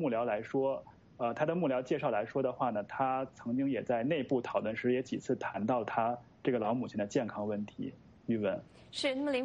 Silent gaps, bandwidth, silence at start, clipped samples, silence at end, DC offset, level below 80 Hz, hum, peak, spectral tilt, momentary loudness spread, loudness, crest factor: none; 9.6 kHz; 0 s; under 0.1%; 0 s; under 0.1%; -70 dBFS; none; -18 dBFS; -6.5 dB/octave; 6 LU; -34 LUFS; 16 dB